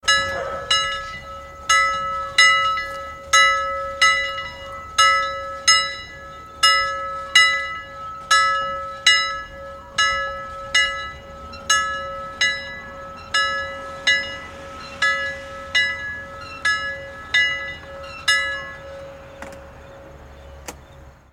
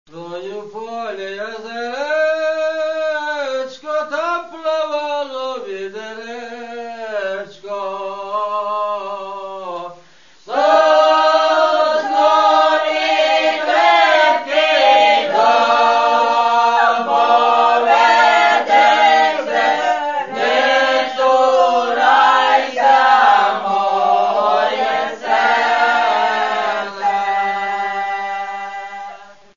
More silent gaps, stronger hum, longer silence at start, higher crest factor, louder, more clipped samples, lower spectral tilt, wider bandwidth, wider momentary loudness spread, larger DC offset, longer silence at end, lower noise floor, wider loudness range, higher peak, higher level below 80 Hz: neither; neither; about the same, 0.05 s vs 0.15 s; first, 22 dB vs 14 dB; second, -19 LUFS vs -15 LUFS; neither; second, 0.5 dB/octave vs -2 dB/octave; first, 16 kHz vs 7.4 kHz; first, 20 LU vs 16 LU; second, under 0.1% vs 0.4%; second, 0.2 s vs 0.35 s; about the same, -45 dBFS vs -48 dBFS; second, 6 LU vs 11 LU; about the same, 0 dBFS vs -2 dBFS; first, -48 dBFS vs -74 dBFS